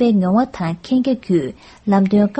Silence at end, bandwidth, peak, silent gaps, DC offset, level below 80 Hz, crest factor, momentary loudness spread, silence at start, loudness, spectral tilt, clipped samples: 0 s; 8.4 kHz; -4 dBFS; none; under 0.1%; -50 dBFS; 14 dB; 10 LU; 0 s; -18 LUFS; -8.5 dB/octave; under 0.1%